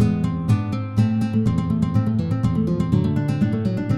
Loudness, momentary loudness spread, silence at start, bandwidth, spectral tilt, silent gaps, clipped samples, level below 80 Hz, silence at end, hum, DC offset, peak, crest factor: -21 LUFS; 2 LU; 0 s; 11.5 kHz; -9 dB/octave; none; under 0.1%; -40 dBFS; 0 s; none; under 0.1%; -4 dBFS; 14 dB